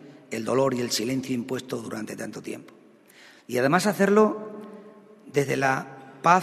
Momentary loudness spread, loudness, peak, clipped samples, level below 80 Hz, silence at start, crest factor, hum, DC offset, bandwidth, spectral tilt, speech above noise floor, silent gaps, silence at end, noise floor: 18 LU; -25 LUFS; -4 dBFS; under 0.1%; -70 dBFS; 0 s; 22 dB; none; under 0.1%; 13.5 kHz; -5 dB/octave; 28 dB; none; 0 s; -53 dBFS